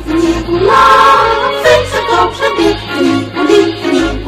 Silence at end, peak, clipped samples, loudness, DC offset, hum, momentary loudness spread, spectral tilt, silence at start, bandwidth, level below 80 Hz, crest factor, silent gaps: 0 s; 0 dBFS; 0.6%; -9 LUFS; under 0.1%; none; 7 LU; -4.5 dB/octave; 0 s; 15.5 kHz; -30 dBFS; 10 dB; none